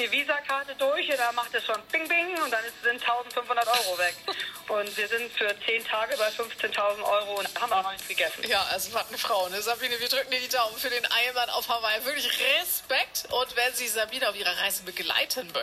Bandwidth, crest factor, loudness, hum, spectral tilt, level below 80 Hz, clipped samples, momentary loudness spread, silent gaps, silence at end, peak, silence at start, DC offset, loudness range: 16 kHz; 18 dB; -27 LUFS; none; 0 dB/octave; -66 dBFS; under 0.1%; 5 LU; none; 0 s; -10 dBFS; 0 s; under 0.1%; 2 LU